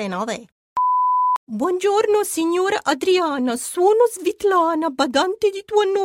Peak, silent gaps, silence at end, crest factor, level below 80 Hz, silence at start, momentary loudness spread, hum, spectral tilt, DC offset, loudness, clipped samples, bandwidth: -4 dBFS; 0.52-0.76 s, 1.37-1.47 s; 0 s; 14 dB; -64 dBFS; 0 s; 6 LU; none; -3.5 dB/octave; under 0.1%; -19 LUFS; under 0.1%; 16.5 kHz